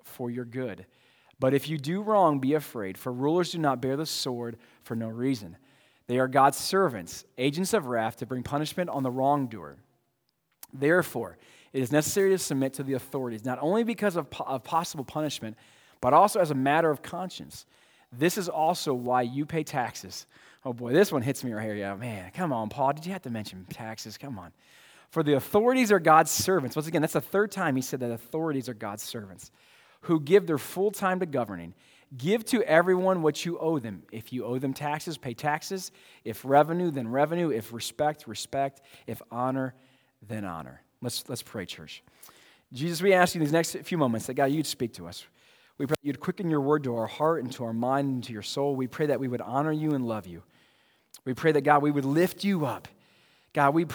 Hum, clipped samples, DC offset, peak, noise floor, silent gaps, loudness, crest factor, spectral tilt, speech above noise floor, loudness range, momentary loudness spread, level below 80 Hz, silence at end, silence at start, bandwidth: none; under 0.1%; under 0.1%; -4 dBFS; -76 dBFS; none; -28 LUFS; 24 dB; -5 dB/octave; 48 dB; 5 LU; 17 LU; -68 dBFS; 0 s; 0.05 s; over 20 kHz